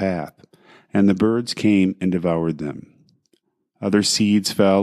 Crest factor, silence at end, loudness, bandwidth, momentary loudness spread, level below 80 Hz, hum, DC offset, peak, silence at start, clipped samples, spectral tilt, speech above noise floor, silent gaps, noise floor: 18 dB; 0 s; -19 LUFS; 13.5 kHz; 12 LU; -58 dBFS; none; under 0.1%; -4 dBFS; 0 s; under 0.1%; -5 dB/octave; 48 dB; none; -66 dBFS